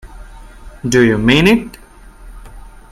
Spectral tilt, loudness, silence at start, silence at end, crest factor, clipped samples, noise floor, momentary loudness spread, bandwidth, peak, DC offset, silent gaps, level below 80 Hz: -5.5 dB/octave; -12 LUFS; 0.05 s; 0.25 s; 16 dB; under 0.1%; -37 dBFS; 15 LU; 15 kHz; 0 dBFS; under 0.1%; none; -34 dBFS